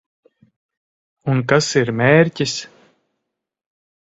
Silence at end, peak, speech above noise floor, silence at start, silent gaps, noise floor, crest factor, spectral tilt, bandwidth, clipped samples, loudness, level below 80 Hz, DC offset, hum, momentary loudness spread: 1.5 s; 0 dBFS; 64 dB; 1.25 s; none; -80 dBFS; 20 dB; -5 dB/octave; 8.2 kHz; under 0.1%; -17 LUFS; -56 dBFS; under 0.1%; none; 11 LU